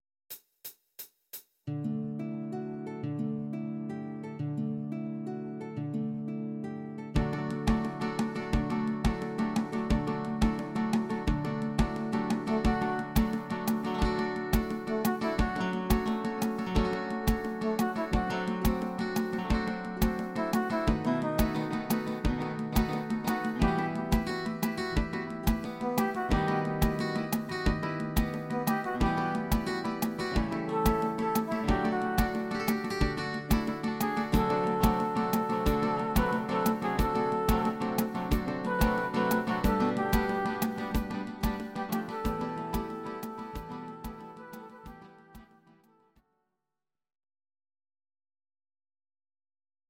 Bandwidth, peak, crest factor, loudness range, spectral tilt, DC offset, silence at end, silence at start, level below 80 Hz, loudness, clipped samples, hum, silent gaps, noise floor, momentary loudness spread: 16.5 kHz; -12 dBFS; 20 dB; 7 LU; -6 dB/octave; under 0.1%; 4.45 s; 0.3 s; -40 dBFS; -31 LUFS; under 0.1%; none; none; under -90 dBFS; 9 LU